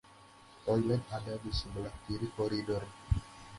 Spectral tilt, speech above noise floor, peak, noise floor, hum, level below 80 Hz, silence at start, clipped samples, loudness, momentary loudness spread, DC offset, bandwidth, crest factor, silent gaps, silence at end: -7 dB/octave; 23 dB; -16 dBFS; -58 dBFS; none; -46 dBFS; 0.05 s; under 0.1%; -36 LUFS; 9 LU; under 0.1%; 11.5 kHz; 20 dB; none; 0 s